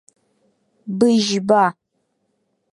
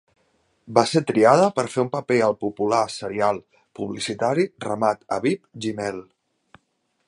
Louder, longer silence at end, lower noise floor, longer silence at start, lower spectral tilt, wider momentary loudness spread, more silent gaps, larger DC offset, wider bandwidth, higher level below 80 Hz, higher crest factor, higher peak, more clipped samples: first, -17 LUFS vs -22 LUFS; about the same, 1 s vs 1.05 s; about the same, -70 dBFS vs -71 dBFS; first, 0.85 s vs 0.65 s; about the same, -5 dB/octave vs -5.5 dB/octave; about the same, 13 LU vs 13 LU; neither; neither; about the same, 11.5 kHz vs 11.5 kHz; about the same, -68 dBFS vs -64 dBFS; about the same, 18 dB vs 22 dB; about the same, -2 dBFS vs 0 dBFS; neither